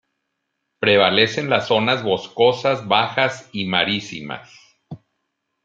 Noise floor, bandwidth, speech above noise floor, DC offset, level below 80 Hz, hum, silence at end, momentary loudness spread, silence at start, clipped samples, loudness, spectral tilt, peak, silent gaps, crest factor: -76 dBFS; 7.8 kHz; 57 dB; under 0.1%; -66 dBFS; none; 0.7 s; 13 LU; 0.8 s; under 0.1%; -18 LUFS; -4.5 dB/octave; -2 dBFS; none; 20 dB